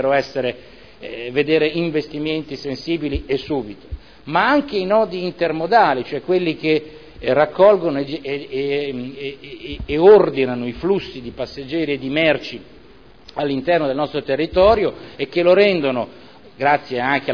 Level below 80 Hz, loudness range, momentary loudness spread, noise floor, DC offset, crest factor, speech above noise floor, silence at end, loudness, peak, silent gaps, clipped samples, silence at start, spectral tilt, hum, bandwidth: -42 dBFS; 4 LU; 17 LU; -46 dBFS; 0.4%; 18 dB; 28 dB; 0 s; -18 LUFS; -2 dBFS; none; under 0.1%; 0 s; -7 dB/octave; none; 5.4 kHz